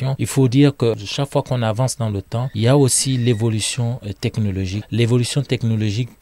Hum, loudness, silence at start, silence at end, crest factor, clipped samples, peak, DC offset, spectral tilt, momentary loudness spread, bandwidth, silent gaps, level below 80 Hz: none; -19 LUFS; 0 s; 0.15 s; 14 dB; under 0.1%; -4 dBFS; under 0.1%; -5.5 dB/octave; 9 LU; 15 kHz; none; -50 dBFS